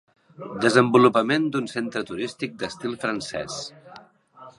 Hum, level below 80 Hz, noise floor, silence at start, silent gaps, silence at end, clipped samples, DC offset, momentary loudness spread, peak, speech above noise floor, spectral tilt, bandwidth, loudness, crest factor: none; -64 dBFS; -48 dBFS; 0.4 s; none; 0.1 s; under 0.1%; under 0.1%; 16 LU; -2 dBFS; 25 dB; -5 dB/octave; 11.5 kHz; -23 LUFS; 22 dB